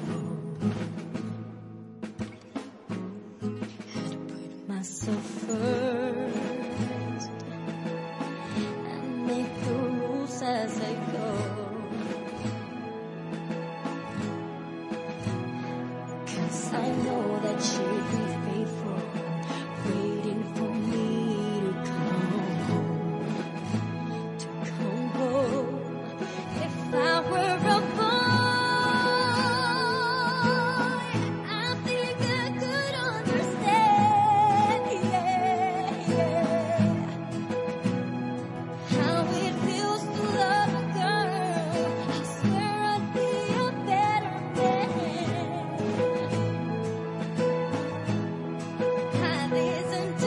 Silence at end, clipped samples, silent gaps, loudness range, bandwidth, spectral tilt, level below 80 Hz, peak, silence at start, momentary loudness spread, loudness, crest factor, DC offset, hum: 0 s; under 0.1%; none; 10 LU; 11.5 kHz; -5.5 dB/octave; -66 dBFS; -10 dBFS; 0 s; 12 LU; -28 LUFS; 18 dB; under 0.1%; none